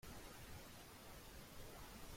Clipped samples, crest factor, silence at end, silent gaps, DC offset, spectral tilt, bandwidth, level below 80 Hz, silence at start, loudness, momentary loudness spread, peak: under 0.1%; 14 dB; 0 s; none; under 0.1%; -3.5 dB/octave; 16.5 kHz; -62 dBFS; 0 s; -57 LUFS; 2 LU; -42 dBFS